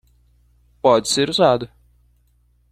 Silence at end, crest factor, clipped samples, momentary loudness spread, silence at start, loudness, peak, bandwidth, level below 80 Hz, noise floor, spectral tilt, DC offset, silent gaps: 1.05 s; 20 dB; under 0.1%; 8 LU; 0.85 s; -17 LUFS; -2 dBFS; 15 kHz; -54 dBFS; -59 dBFS; -4 dB/octave; under 0.1%; none